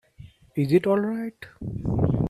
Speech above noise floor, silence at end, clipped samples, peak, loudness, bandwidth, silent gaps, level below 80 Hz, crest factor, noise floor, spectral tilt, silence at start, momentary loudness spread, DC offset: 24 dB; 0 s; under 0.1%; -8 dBFS; -25 LUFS; 13.5 kHz; none; -44 dBFS; 18 dB; -49 dBFS; -9 dB/octave; 0.2 s; 15 LU; under 0.1%